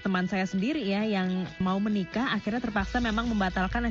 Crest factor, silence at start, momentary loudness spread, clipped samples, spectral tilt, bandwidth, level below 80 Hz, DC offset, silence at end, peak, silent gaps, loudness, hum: 14 dB; 0 s; 2 LU; under 0.1%; -4.5 dB/octave; 7.6 kHz; -42 dBFS; under 0.1%; 0 s; -14 dBFS; none; -28 LUFS; none